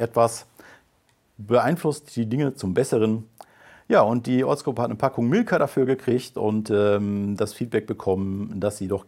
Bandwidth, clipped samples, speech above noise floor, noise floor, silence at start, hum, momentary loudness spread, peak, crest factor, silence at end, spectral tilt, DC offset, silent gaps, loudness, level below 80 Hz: 16.5 kHz; under 0.1%; 42 dB; -64 dBFS; 0 s; none; 7 LU; -4 dBFS; 20 dB; 0.05 s; -6.5 dB/octave; under 0.1%; none; -23 LUFS; -64 dBFS